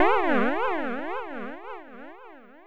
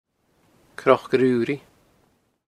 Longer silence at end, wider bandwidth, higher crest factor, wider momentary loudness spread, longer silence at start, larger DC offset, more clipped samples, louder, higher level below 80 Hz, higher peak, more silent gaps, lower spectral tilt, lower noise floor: second, 0 s vs 0.9 s; second, 10 kHz vs 12 kHz; second, 18 dB vs 24 dB; first, 22 LU vs 13 LU; second, 0 s vs 0.8 s; neither; neither; second, -27 LUFS vs -21 LUFS; first, -60 dBFS vs -66 dBFS; second, -10 dBFS vs 0 dBFS; neither; about the same, -6.5 dB/octave vs -7 dB/octave; second, -48 dBFS vs -65 dBFS